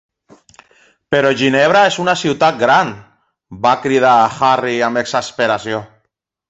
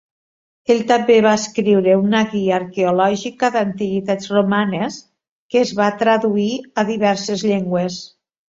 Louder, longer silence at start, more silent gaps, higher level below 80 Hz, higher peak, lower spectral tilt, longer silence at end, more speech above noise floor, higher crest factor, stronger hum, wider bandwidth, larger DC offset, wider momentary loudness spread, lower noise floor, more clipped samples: first, -14 LUFS vs -17 LUFS; first, 1.1 s vs 0.7 s; second, none vs 5.29-5.49 s; about the same, -56 dBFS vs -60 dBFS; about the same, 0 dBFS vs -2 dBFS; about the same, -4.5 dB/octave vs -5.5 dB/octave; first, 0.65 s vs 0.4 s; second, 56 dB vs over 73 dB; about the same, 14 dB vs 16 dB; neither; about the same, 8.2 kHz vs 7.8 kHz; neither; about the same, 8 LU vs 8 LU; second, -70 dBFS vs under -90 dBFS; neither